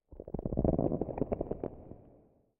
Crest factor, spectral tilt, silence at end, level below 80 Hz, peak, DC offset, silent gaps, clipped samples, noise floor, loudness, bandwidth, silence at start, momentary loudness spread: 22 dB; -13.5 dB/octave; 0.5 s; -46 dBFS; -14 dBFS; under 0.1%; none; under 0.1%; -64 dBFS; -35 LUFS; 3 kHz; 0.1 s; 21 LU